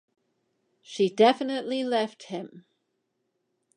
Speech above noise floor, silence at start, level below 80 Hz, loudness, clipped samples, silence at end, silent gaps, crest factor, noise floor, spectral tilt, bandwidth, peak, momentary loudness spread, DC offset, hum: 52 dB; 0.9 s; -84 dBFS; -25 LUFS; under 0.1%; 1.15 s; none; 22 dB; -78 dBFS; -5 dB/octave; 10 kHz; -8 dBFS; 18 LU; under 0.1%; none